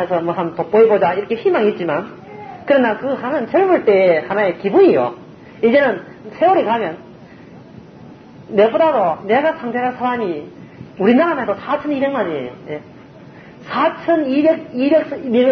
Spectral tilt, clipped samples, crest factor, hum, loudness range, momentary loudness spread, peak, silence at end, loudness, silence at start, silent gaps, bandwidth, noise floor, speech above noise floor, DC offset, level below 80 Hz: -8 dB/octave; under 0.1%; 14 dB; none; 4 LU; 15 LU; -2 dBFS; 0 s; -16 LUFS; 0 s; none; 6.2 kHz; -39 dBFS; 24 dB; under 0.1%; -60 dBFS